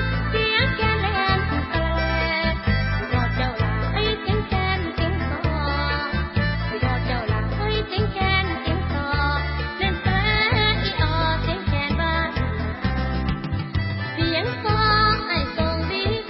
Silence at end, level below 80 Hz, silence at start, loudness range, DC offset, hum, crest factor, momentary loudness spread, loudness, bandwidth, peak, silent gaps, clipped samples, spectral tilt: 0 s; -28 dBFS; 0 s; 2 LU; under 0.1%; none; 16 dB; 6 LU; -22 LUFS; 5.8 kHz; -6 dBFS; none; under 0.1%; -10 dB/octave